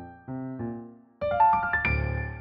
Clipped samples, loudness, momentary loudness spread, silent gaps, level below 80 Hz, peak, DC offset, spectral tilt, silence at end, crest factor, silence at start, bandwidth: under 0.1%; -26 LUFS; 16 LU; none; -40 dBFS; -12 dBFS; under 0.1%; -5.5 dB/octave; 0 s; 16 dB; 0 s; 5.2 kHz